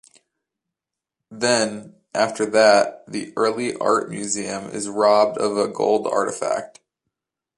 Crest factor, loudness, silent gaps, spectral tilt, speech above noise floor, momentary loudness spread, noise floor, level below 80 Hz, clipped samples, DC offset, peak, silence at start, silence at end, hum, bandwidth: 20 dB; -20 LUFS; none; -3 dB/octave; 66 dB; 12 LU; -86 dBFS; -68 dBFS; under 0.1%; under 0.1%; -2 dBFS; 1.3 s; 0.9 s; none; 11.5 kHz